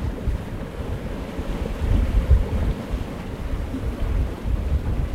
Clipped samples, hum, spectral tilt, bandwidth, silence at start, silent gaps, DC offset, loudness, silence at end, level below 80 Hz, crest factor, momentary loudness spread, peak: under 0.1%; none; -7.5 dB/octave; 14 kHz; 0 s; none; 0.2%; -26 LUFS; 0 s; -24 dBFS; 18 dB; 10 LU; -4 dBFS